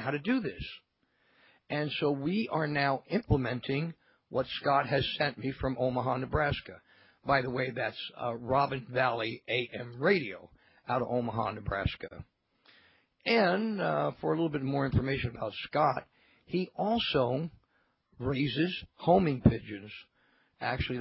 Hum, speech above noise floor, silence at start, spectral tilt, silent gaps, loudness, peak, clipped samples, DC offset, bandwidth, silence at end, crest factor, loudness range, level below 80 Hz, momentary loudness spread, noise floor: none; 42 dB; 0 s; -4.5 dB/octave; none; -31 LUFS; -6 dBFS; under 0.1%; under 0.1%; 5.6 kHz; 0 s; 26 dB; 3 LU; -50 dBFS; 12 LU; -73 dBFS